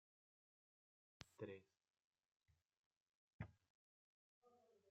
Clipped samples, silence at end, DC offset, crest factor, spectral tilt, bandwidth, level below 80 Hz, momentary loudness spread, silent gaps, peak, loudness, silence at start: under 0.1%; 0 s; under 0.1%; 32 dB; -6 dB/octave; 7.2 kHz; -84 dBFS; 9 LU; 1.90-1.94 s, 2.04-2.11 s, 2.28-2.40 s, 2.77-2.91 s, 2.97-3.39 s, 3.70-4.42 s; -34 dBFS; -60 LUFS; 1.2 s